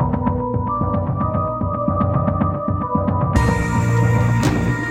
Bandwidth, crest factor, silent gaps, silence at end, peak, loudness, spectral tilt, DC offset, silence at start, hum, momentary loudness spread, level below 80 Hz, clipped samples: 13 kHz; 16 dB; none; 0 s; -2 dBFS; -19 LUFS; -7.5 dB/octave; under 0.1%; 0 s; none; 5 LU; -30 dBFS; under 0.1%